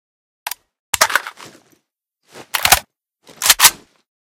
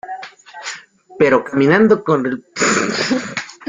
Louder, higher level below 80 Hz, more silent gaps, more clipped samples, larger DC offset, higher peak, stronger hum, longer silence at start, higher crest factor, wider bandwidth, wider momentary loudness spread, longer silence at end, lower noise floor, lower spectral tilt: about the same, -14 LUFS vs -15 LUFS; first, -46 dBFS vs -58 dBFS; first, 0.79-0.93 s vs none; first, 0.2% vs under 0.1%; neither; about the same, 0 dBFS vs -2 dBFS; neither; first, 0.45 s vs 0.05 s; about the same, 20 dB vs 16 dB; first, over 20 kHz vs 9.6 kHz; first, 21 LU vs 18 LU; first, 0.6 s vs 0.15 s; first, -70 dBFS vs -35 dBFS; second, 1 dB/octave vs -4.5 dB/octave